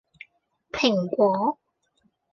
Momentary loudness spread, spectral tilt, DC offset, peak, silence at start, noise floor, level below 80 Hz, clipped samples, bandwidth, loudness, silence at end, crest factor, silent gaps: 14 LU; -5.5 dB/octave; under 0.1%; -8 dBFS; 0.75 s; -69 dBFS; -64 dBFS; under 0.1%; 7.2 kHz; -23 LUFS; 0.8 s; 20 dB; none